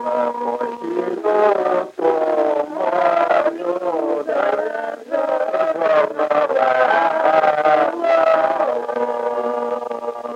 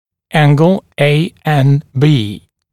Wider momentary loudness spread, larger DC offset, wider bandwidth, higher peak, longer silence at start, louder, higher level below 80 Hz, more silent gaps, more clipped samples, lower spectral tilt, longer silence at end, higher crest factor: about the same, 8 LU vs 7 LU; second, under 0.1% vs 0.7%; second, 9 kHz vs 12.5 kHz; about the same, -2 dBFS vs 0 dBFS; second, 0 s vs 0.35 s; second, -18 LUFS vs -12 LUFS; second, -74 dBFS vs -50 dBFS; neither; neither; second, -5 dB/octave vs -7.5 dB/octave; second, 0 s vs 0.35 s; about the same, 16 dB vs 12 dB